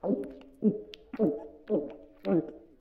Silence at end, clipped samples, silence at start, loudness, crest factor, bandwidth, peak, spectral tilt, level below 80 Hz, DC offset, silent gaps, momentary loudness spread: 0.2 s; under 0.1%; 0.05 s; -32 LUFS; 18 dB; 6 kHz; -14 dBFS; -10 dB/octave; -64 dBFS; under 0.1%; none; 13 LU